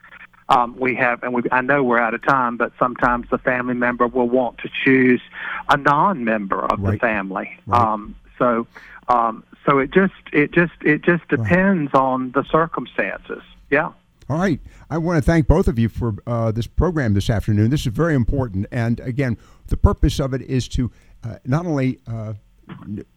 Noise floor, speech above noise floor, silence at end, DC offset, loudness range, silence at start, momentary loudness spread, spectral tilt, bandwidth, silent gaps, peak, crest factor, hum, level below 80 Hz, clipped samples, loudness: -41 dBFS; 22 dB; 0.15 s; under 0.1%; 4 LU; 0.1 s; 12 LU; -7.5 dB/octave; 15.5 kHz; none; -2 dBFS; 18 dB; none; -32 dBFS; under 0.1%; -19 LUFS